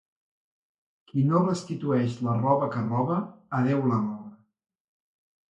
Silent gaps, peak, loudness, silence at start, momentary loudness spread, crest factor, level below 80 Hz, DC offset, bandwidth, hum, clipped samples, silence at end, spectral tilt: none; -10 dBFS; -26 LUFS; 1.15 s; 8 LU; 18 dB; -66 dBFS; under 0.1%; 9.2 kHz; none; under 0.1%; 1.15 s; -8.5 dB/octave